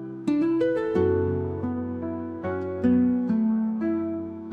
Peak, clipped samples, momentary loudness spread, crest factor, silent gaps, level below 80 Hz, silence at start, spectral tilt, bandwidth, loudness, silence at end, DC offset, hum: -12 dBFS; under 0.1%; 9 LU; 14 dB; none; -62 dBFS; 0 s; -9.5 dB/octave; 4.9 kHz; -26 LUFS; 0 s; under 0.1%; none